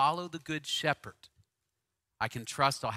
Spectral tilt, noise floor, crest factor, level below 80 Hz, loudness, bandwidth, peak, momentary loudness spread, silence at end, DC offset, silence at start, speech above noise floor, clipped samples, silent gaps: -3.5 dB/octave; -85 dBFS; 24 dB; -68 dBFS; -33 LUFS; 16 kHz; -10 dBFS; 8 LU; 0 s; under 0.1%; 0 s; 51 dB; under 0.1%; none